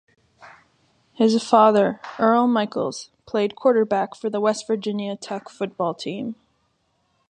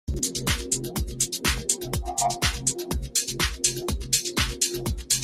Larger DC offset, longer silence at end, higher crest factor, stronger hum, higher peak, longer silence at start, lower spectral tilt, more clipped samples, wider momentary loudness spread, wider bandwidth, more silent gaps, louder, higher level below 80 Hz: neither; first, 0.95 s vs 0 s; about the same, 20 dB vs 22 dB; neither; first, -2 dBFS vs -6 dBFS; first, 0.4 s vs 0.05 s; first, -5.5 dB/octave vs -2 dB/octave; neither; first, 15 LU vs 4 LU; second, 9.8 kHz vs 16 kHz; neither; first, -21 LUFS vs -25 LUFS; second, -70 dBFS vs -36 dBFS